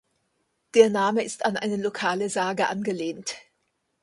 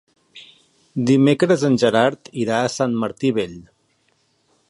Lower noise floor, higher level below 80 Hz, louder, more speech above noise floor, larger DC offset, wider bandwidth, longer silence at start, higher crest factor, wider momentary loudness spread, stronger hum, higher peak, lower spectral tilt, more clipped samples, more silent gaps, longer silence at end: first, -75 dBFS vs -64 dBFS; second, -70 dBFS vs -60 dBFS; second, -24 LUFS vs -19 LUFS; first, 51 dB vs 46 dB; neither; about the same, 11.5 kHz vs 11.5 kHz; first, 0.75 s vs 0.35 s; about the same, 22 dB vs 18 dB; about the same, 12 LU vs 10 LU; neither; about the same, -4 dBFS vs -2 dBFS; second, -4 dB/octave vs -6 dB/octave; neither; neither; second, 0.65 s vs 1.1 s